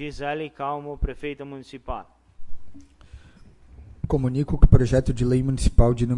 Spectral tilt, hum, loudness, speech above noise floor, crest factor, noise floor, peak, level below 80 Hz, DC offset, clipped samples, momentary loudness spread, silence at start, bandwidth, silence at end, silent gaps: -7.5 dB/octave; none; -23 LUFS; 29 dB; 22 dB; -49 dBFS; 0 dBFS; -26 dBFS; under 0.1%; under 0.1%; 18 LU; 0 s; 11 kHz; 0 s; none